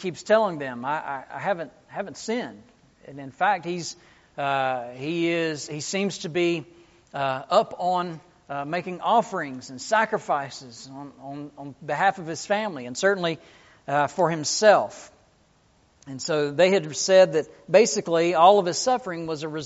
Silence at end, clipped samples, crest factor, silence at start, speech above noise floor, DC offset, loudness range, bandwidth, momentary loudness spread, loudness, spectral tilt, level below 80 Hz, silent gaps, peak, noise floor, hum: 0 s; under 0.1%; 22 dB; 0 s; 37 dB; under 0.1%; 8 LU; 8 kHz; 20 LU; -24 LUFS; -3 dB/octave; -68 dBFS; none; -4 dBFS; -61 dBFS; none